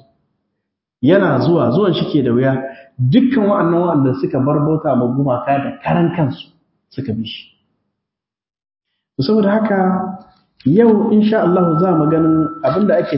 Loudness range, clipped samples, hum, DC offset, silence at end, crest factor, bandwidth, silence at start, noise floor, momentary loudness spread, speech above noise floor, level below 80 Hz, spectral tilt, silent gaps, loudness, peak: 8 LU; under 0.1%; none; under 0.1%; 0 s; 16 dB; 5.8 kHz; 1 s; -83 dBFS; 11 LU; 69 dB; -52 dBFS; -12 dB/octave; none; -15 LUFS; 0 dBFS